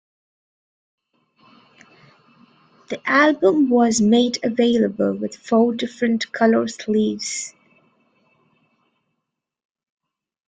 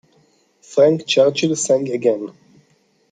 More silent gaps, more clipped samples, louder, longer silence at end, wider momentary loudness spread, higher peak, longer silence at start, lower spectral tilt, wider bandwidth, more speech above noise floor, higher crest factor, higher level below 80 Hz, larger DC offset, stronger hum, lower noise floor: neither; neither; about the same, -19 LUFS vs -17 LUFS; first, 3 s vs 0.8 s; about the same, 11 LU vs 9 LU; about the same, -4 dBFS vs -2 dBFS; first, 2.9 s vs 0.7 s; about the same, -4.5 dB/octave vs -4 dB/octave; about the same, 9.6 kHz vs 9.4 kHz; first, 62 dB vs 43 dB; about the same, 18 dB vs 16 dB; first, -64 dBFS vs -70 dBFS; neither; neither; first, -81 dBFS vs -60 dBFS